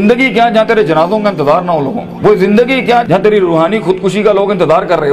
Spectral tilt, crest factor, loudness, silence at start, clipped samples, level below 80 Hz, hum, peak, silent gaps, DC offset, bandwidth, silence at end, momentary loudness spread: -6.5 dB/octave; 10 dB; -10 LUFS; 0 s; under 0.1%; -42 dBFS; none; 0 dBFS; none; under 0.1%; 13 kHz; 0 s; 4 LU